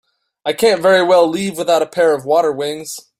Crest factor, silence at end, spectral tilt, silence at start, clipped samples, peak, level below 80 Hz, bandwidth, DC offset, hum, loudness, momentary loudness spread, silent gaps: 14 dB; 0.2 s; -4 dB/octave; 0.45 s; under 0.1%; 0 dBFS; -60 dBFS; 16 kHz; under 0.1%; none; -14 LUFS; 12 LU; none